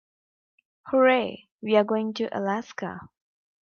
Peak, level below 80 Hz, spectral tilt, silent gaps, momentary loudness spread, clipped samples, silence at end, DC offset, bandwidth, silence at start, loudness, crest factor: -8 dBFS; -74 dBFS; -6 dB/octave; 1.52-1.59 s; 16 LU; under 0.1%; 0.55 s; under 0.1%; 6.8 kHz; 0.85 s; -25 LUFS; 18 dB